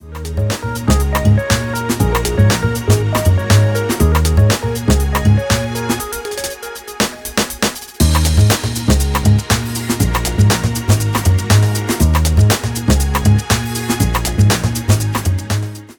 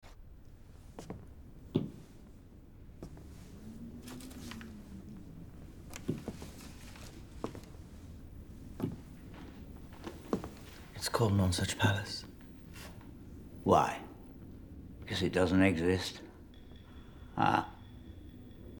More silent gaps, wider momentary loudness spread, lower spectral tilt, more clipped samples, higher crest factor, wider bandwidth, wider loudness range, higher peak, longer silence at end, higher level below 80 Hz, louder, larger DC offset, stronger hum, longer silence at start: neither; second, 7 LU vs 24 LU; about the same, -5 dB/octave vs -5.5 dB/octave; neither; second, 14 dB vs 26 dB; about the same, 19.5 kHz vs 19.5 kHz; second, 3 LU vs 14 LU; first, 0 dBFS vs -12 dBFS; about the same, 0.05 s vs 0 s; first, -22 dBFS vs -54 dBFS; first, -15 LUFS vs -34 LUFS; neither; neither; about the same, 0.05 s vs 0.05 s